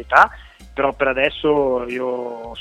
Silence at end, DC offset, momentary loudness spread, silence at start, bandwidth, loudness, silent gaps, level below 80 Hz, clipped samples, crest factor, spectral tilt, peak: 0 s; under 0.1%; 13 LU; 0 s; 12 kHz; -19 LUFS; none; -44 dBFS; under 0.1%; 20 dB; -5.5 dB/octave; 0 dBFS